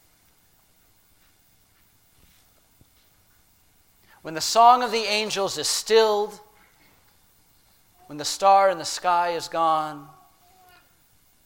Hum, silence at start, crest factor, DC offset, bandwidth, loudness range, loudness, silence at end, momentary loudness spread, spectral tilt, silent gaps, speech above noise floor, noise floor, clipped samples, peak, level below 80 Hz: none; 4.25 s; 22 dB; under 0.1%; 17 kHz; 4 LU; -21 LUFS; 1.4 s; 17 LU; -1.5 dB/octave; none; 39 dB; -60 dBFS; under 0.1%; -4 dBFS; -66 dBFS